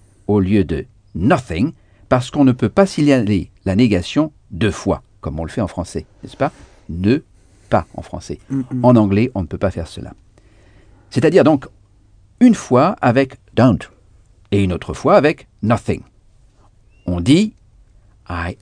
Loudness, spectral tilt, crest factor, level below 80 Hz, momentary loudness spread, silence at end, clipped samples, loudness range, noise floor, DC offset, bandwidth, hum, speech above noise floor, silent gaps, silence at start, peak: -17 LUFS; -7 dB/octave; 18 dB; -40 dBFS; 15 LU; 0.1 s; under 0.1%; 6 LU; -50 dBFS; under 0.1%; 10 kHz; none; 34 dB; none; 0.3 s; 0 dBFS